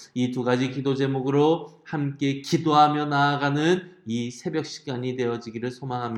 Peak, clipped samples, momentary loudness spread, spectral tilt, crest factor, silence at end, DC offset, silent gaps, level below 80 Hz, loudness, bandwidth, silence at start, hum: -4 dBFS; under 0.1%; 11 LU; -6 dB/octave; 20 dB; 0 s; under 0.1%; none; -70 dBFS; -25 LUFS; 12 kHz; 0 s; none